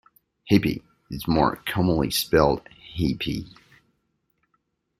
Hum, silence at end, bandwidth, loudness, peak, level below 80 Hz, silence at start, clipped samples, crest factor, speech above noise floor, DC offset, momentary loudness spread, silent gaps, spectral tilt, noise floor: none; 1.5 s; 16 kHz; -23 LUFS; -2 dBFS; -44 dBFS; 0.45 s; under 0.1%; 22 dB; 50 dB; under 0.1%; 13 LU; none; -5.5 dB/octave; -73 dBFS